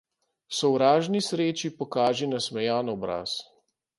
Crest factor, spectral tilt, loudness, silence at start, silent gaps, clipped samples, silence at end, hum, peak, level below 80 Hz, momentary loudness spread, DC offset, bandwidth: 20 dB; -4.5 dB/octave; -26 LUFS; 0.5 s; none; under 0.1%; 0.55 s; none; -8 dBFS; -68 dBFS; 10 LU; under 0.1%; 11.5 kHz